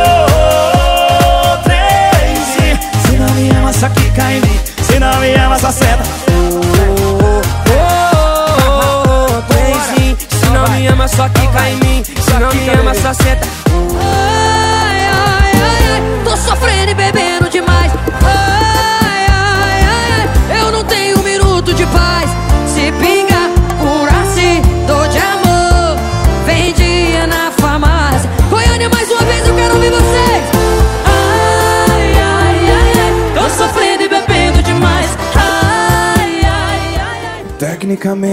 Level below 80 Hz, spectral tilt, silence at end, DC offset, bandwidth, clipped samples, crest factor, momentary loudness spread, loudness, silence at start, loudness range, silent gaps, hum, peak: -16 dBFS; -5 dB/octave; 0 s; under 0.1%; 16.5 kHz; under 0.1%; 10 dB; 4 LU; -10 LUFS; 0 s; 1 LU; none; none; 0 dBFS